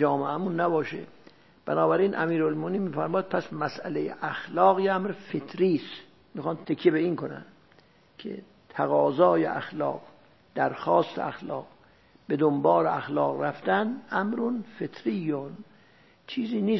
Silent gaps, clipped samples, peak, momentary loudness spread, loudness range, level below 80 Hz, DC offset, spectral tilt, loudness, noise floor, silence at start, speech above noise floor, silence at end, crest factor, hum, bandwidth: none; under 0.1%; -6 dBFS; 17 LU; 3 LU; -72 dBFS; 0.1%; -8.5 dB/octave; -27 LUFS; -59 dBFS; 0 s; 33 dB; 0 s; 20 dB; none; 6 kHz